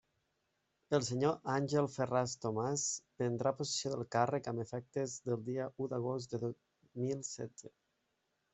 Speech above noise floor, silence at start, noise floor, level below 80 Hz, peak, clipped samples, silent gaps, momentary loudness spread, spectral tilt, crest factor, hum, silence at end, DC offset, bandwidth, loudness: 46 dB; 0.9 s; -82 dBFS; -76 dBFS; -16 dBFS; under 0.1%; none; 8 LU; -5 dB/octave; 22 dB; none; 0.85 s; under 0.1%; 8.2 kHz; -37 LUFS